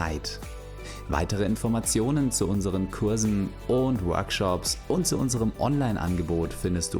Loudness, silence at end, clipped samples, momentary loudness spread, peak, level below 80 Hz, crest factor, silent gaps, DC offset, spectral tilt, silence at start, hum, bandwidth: -26 LUFS; 0 s; under 0.1%; 7 LU; -10 dBFS; -40 dBFS; 16 dB; none; under 0.1%; -5 dB/octave; 0 s; none; over 20 kHz